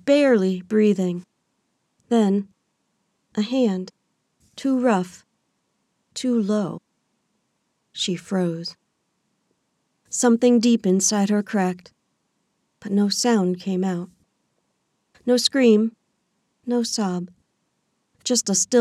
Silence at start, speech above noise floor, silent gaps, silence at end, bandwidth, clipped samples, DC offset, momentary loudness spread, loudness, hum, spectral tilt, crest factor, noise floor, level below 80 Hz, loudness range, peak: 0.05 s; 52 dB; none; 0 s; 14 kHz; under 0.1%; under 0.1%; 17 LU; -21 LUFS; none; -4.5 dB/octave; 18 dB; -72 dBFS; -72 dBFS; 6 LU; -4 dBFS